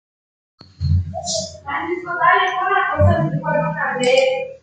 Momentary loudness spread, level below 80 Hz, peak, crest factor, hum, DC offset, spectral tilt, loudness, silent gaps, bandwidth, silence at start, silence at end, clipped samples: 9 LU; -46 dBFS; -2 dBFS; 16 dB; none; under 0.1%; -5 dB/octave; -18 LUFS; none; 9.4 kHz; 0.8 s; 0.05 s; under 0.1%